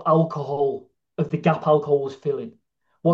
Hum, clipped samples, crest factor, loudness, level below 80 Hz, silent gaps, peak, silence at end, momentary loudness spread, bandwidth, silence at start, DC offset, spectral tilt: none; under 0.1%; 18 dB; -23 LUFS; -68 dBFS; none; -4 dBFS; 0 s; 14 LU; 7 kHz; 0 s; under 0.1%; -9 dB/octave